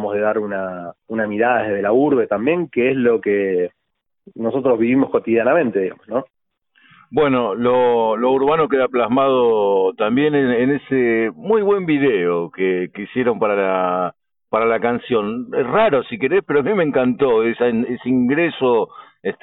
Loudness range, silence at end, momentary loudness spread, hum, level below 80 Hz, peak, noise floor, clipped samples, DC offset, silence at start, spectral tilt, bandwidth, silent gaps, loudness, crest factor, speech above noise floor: 3 LU; 0.1 s; 8 LU; none; -58 dBFS; -4 dBFS; -60 dBFS; under 0.1%; under 0.1%; 0 s; -11.5 dB/octave; 4 kHz; none; -18 LUFS; 14 dB; 43 dB